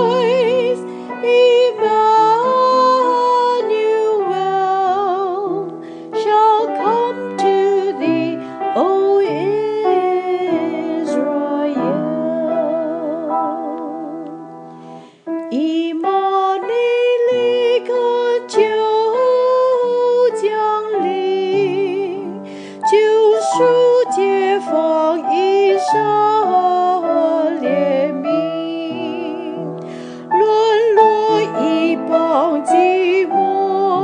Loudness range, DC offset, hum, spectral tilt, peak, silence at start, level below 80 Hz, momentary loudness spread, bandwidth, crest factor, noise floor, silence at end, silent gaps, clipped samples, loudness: 6 LU; under 0.1%; none; -5 dB/octave; 0 dBFS; 0 s; -80 dBFS; 11 LU; 10 kHz; 16 dB; -37 dBFS; 0 s; none; under 0.1%; -16 LUFS